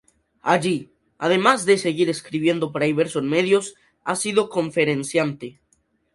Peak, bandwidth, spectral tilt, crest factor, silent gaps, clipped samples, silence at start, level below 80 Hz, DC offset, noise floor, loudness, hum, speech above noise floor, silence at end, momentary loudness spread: 0 dBFS; 11.5 kHz; -4.5 dB/octave; 22 dB; none; under 0.1%; 0.45 s; -64 dBFS; under 0.1%; -66 dBFS; -21 LUFS; none; 45 dB; 0.65 s; 10 LU